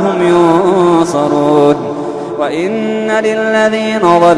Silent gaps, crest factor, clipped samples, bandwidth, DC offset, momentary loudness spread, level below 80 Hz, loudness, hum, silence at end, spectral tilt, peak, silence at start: none; 10 dB; under 0.1%; 11 kHz; under 0.1%; 8 LU; -50 dBFS; -11 LUFS; none; 0 s; -6 dB/octave; 0 dBFS; 0 s